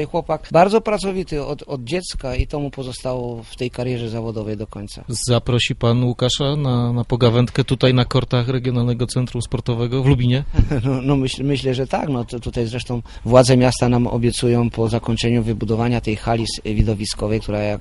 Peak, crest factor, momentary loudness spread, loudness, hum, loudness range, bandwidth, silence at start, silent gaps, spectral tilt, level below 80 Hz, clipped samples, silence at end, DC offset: 0 dBFS; 18 dB; 11 LU; -19 LUFS; none; 7 LU; 11.5 kHz; 0 s; none; -6 dB/octave; -32 dBFS; under 0.1%; 0 s; under 0.1%